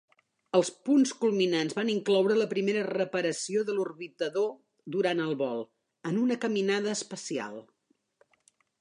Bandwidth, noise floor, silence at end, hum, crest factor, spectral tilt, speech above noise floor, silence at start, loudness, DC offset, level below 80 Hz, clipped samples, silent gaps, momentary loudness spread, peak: 11 kHz; -69 dBFS; 1.2 s; none; 18 dB; -4.5 dB/octave; 41 dB; 0.55 s; -29 LUFS; under 0.1%; -82 dBFS; under 0.1%; none; 11 LU; -12 dBFS